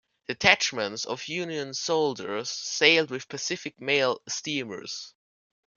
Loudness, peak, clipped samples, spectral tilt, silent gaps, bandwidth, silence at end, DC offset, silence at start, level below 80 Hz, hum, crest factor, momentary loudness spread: -26 LUFS; 0 dBFS; under 0.1%; -2 dB/octave; none; 7.4 kHz; 0.65 s; under 0.1%; 0.3 s; -68 dBFS; none; 28 dB; 15 LU